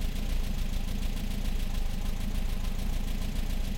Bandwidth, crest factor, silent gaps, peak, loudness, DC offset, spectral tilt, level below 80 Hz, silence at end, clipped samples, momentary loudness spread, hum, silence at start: 16.5 kHz; 8 dB; none; -20 dBFS; -36 LUFS; under 0.1%; -5 dB/octave; -30 dBFS; 0 s; under 0.1%; 1 LU; none; 0 s